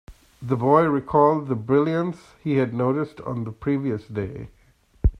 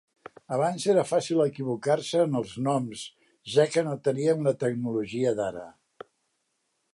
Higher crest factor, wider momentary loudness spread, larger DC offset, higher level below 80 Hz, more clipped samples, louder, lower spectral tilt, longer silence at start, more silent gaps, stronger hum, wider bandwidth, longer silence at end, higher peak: about the same, 18 dB vs 18 dB; first, 13 LU vs 9 LU; neither; first, -36 dBFS vs -70 dBFS; neither; first, -23 LUFS vs -27 LUFS; first, -9.5 dB/octave vs -6 dB/octave; second, 0.1 s vs 0.5 s; neither; neither; second, 10 kHz vs 11.5 kHz; second, 0 s vs 1.2 s; first, -4 dBFS vs -8 dBFS